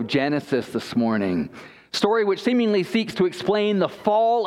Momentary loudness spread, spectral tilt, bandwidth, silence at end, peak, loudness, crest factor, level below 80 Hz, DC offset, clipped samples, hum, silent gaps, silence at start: 5 LU; -6 dB/octave; 13.5 kHz; 0 s; -4 dBFS; -22 LUFS; 18 dB; -62 dBFS; under 0.1%; under 0.1%; none; none; 0 s